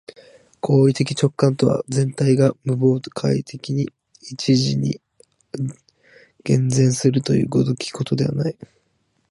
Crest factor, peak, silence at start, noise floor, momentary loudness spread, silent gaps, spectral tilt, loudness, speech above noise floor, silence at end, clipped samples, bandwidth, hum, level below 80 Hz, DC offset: 18 dB; -2 dBFS; 0.65 s; -67 dBFS; 12 LU; none; -6.5 dB/octave; -20 LUFS; 48 dB; 0.8 s; under 0.1%; 11.5 kHz; none; -56 dBFS; under 0.1%